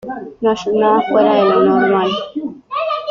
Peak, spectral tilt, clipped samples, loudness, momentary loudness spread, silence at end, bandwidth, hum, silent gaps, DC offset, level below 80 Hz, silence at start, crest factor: -2 dBFS; -6 dB/octave; under 0.1%; -14 LUFS; 12 LU; 0 s; 7.4 kHz; none; none; under 0.1%; -56 dBFS; 0.05 s; 12 dB